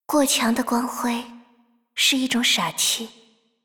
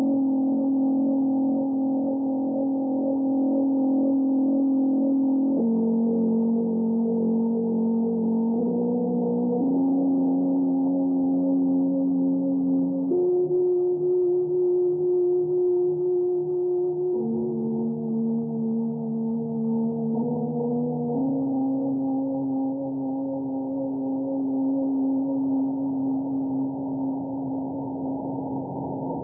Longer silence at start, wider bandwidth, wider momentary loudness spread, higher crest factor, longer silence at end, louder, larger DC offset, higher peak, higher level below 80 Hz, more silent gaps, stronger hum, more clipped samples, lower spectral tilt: about the same, 0.1 s vs 0 s; first, over 20 kHz vs 1.3 kHz; first, 13 LU vs 6 LU; first, 16 dB vs 8 dB; first, 0.55 s vs 0 s; first, -21 LUFS vs -24 LUFS; neither; first, -8 dBFS vs -14 dBFS; about the same, -64 dBFS vs -68 dBFS; neither; neither; neither; second, -1.5 dB/octave vs -16.5 dB/octave